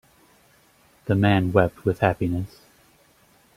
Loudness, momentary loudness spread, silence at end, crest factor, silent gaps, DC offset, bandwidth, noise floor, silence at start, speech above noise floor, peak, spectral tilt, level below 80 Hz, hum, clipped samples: -22 LUFS; 13 LU; 1.1 s; 22 dB; none; under 0.1%; 15 kHz; -58 dBFS; 1.05 s; 37 dB; -4 dBFS; -8 dB/octave; -50 dBFS; none; under 0.1%